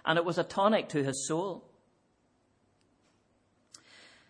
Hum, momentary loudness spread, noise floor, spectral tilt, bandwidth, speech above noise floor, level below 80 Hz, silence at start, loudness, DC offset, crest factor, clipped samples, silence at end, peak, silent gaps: none; 9 LU; -71 dBFS; -4.5 dB/octave; 10.5 kHz; 42 dB; -76 dBFS; 0.05 s; -30 LUFS; under 0.1%; 22 dB; under 0.1%; 2.7 s; -12 dBFS; none